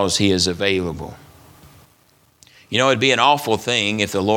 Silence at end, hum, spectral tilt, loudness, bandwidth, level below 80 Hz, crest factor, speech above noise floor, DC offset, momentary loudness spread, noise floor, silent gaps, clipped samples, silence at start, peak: 0 s; none; -3.5 dB/octave; -18 LUFS; 19 kHz; -50 dBFS; 20 dB; 39 dB; under 0.1%; 10 LU; -57 dBFS; none; under 0.1%; 0 s; 0 dBFS